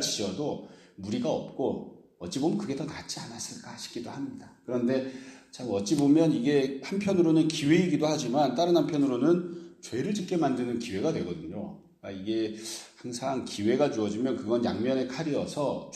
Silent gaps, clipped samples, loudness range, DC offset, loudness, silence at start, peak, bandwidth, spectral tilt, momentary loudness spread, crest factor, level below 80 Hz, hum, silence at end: none; under 0.1%; 8 LU; under 0.1%; -29 LUFS; 0 s; -10 dBFS; 13.5 kHz; -5.5 dB/octave; 16 LU; 18 dB; -66 dBFS; none; 0 s